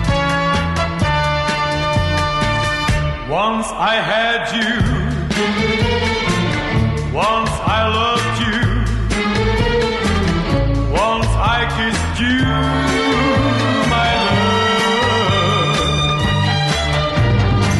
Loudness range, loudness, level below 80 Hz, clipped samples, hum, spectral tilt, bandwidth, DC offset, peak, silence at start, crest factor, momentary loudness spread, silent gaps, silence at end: 2 LU; -16 LUFS; -26 dBFS; under 0.1%; none; -5 dB/octave; 11.5 kHz; under 0.1%; -6 dBFS; 0 s; 10 dB; 3 LU; none; 0 s